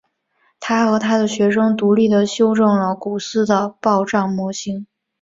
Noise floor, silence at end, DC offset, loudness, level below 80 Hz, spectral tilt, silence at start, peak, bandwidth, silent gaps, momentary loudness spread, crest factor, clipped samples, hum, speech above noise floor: -63 dBFS; 0.4 s; under 0.1%; -17 LUFS; -58 dBFS; -5.5 dB/octave; 0.6 s; -2 dBFS; 7.8 kHz; none; 9 LU; 16 dB; under 0.1%; none; 47 dB